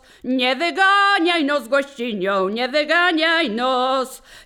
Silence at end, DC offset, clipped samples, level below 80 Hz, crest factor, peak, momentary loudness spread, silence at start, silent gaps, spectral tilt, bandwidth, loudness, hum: 0.05 s; under 0.1%; under 0.1%; -60 dBFS; 16 dB; -4 dBFS; 9 LU; 0.25 s; none; -3.5 dB/octave; 19.5 kHz; -18 LUFS; none